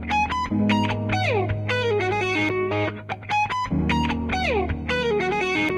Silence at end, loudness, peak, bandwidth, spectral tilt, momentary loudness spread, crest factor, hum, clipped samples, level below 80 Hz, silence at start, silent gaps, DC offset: 0 s; -23 LUFS; -8 dBFS; 10.5 kHz; -6 dB/octave; 3 LU; 14 dB; none; under 0.1%; -38 dBFS; 0 s; none; under 0.1%